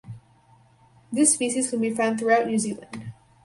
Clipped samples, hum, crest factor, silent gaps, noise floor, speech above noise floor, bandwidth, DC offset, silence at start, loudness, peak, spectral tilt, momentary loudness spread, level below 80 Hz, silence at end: under 0.1%; none; 20 dB; none; -57 dBFS; 34 dB; 11.5 kHz; under 0.1%; 0.05 s; -23 LUFS; -6 dBFS; -3.5 dB/octave; 19 LU; -64 dBFS; 0.3 s